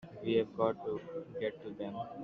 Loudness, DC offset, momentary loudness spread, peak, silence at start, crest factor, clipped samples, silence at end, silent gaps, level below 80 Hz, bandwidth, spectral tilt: -37 LUFS; under 0.1%; 10 LU; -18 dBFS; 0 s; 20 dB; under 0.1%; 0 s; none; -72 dBFS; 6 kHz; -5 dB/octave